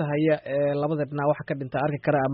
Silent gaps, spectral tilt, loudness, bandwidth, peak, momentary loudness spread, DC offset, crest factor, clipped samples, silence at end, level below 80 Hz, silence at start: none; -7 dB/octave; -26 LUFS; 5 kHz; -10 dBFS; 4 LU; under 0.1%; 14 dB; under 0.1%; 0 s; -62 dBFS; 0 s